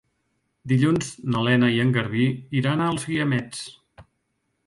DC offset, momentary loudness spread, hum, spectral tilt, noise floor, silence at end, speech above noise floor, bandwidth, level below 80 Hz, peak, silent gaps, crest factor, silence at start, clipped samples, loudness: under 0.1%; 13 LU; none; -6 dB/octave; -74 dBFS; 0.65 s; 52 dB; 11.5 kHz; -56 dBFS; -6 dBFS; none; 18 dB; 0.65 s; under 0.1%; -22 LUFS